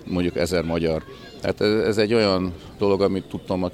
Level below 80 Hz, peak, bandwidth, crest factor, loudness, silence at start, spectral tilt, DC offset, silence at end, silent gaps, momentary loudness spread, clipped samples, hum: -46 dBFS; -6 dBFS; 15 kHz; 18 dB; -23 LUFS; 0 s; -6 dB/octave; under 0.1%; 0 s; none; 10 LU; under 0.1%; none